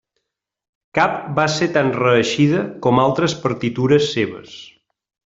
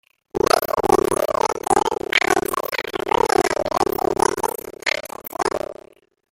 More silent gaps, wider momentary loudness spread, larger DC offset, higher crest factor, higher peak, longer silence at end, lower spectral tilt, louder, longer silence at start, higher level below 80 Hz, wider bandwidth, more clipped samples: neither; about the same, 9 LU vs 8 LU; neither; about the same, 16 dB vs 20 dB; about the same, -2 dBFS vs -2 dBFS; about the same, 0.65 s vs 0.6 s; first, -5.5 dB/octave vs -3 dB/octave; about the same, -18 LUFS vs -20 LUFS; first, 0.95 s vs 0.35 s; second, -54 dBFS vs -46 dBFS; second, 7.8 kHz vs 17 kHz; neither